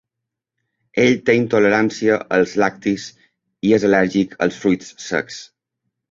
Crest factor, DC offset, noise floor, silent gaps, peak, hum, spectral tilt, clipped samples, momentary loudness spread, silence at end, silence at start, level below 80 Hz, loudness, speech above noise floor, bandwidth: 18 dB; under 0.1%; -82 dBFS; none; -2 dBFS; none; -5.5 dB/octave; under 0.1%; 10 LU; 0.65 s; 0.95 s; -56 dBFS; -18 LUFS; 65 dB; 7.8 kHz